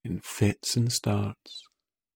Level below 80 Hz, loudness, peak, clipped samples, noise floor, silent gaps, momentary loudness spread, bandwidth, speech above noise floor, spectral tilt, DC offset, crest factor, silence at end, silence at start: -58 dBFS; -28 LUFS; -10 dBFS; under 0.1%; -71 dBFS; none; 18 LU; 18.5 kHz; 43 dB; -4.5 dB/octave; under 0.1%; 18 dB; 0.55 s; 0.05 s